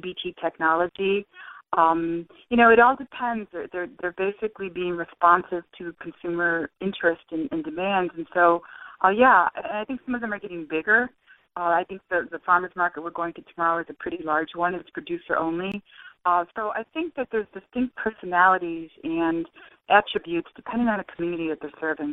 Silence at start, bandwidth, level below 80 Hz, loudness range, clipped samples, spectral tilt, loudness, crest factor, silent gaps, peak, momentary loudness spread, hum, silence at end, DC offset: 0.05 s; 4 kHz; -60 dBFS; 5 LU; under 0.1%; -8 dB/octave; -24 LUFS; 22 dB; none; -4 dBFS; 14 LU; none; 0 s; under 0.1%